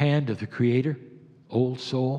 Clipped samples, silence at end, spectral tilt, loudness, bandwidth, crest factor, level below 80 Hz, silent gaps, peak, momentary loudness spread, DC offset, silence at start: under 0.1%; 0 s; -8 dB/octave; -26 LUFS; 8.8 kHz; 16 dB; -72 dBFS; none; -10 dBFS; 7 LU; under 0.1%; 0 s